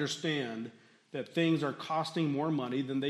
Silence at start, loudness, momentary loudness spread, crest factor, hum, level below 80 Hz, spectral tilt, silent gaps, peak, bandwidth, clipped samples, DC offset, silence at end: 0 s; -33 LUFS; 12 LU; 16 dB; none; -82 dBFS; -5.5 dB/octave; none; -18 dBFS; 12.5 kHz; under 0.1%; under 0.1%; 0 s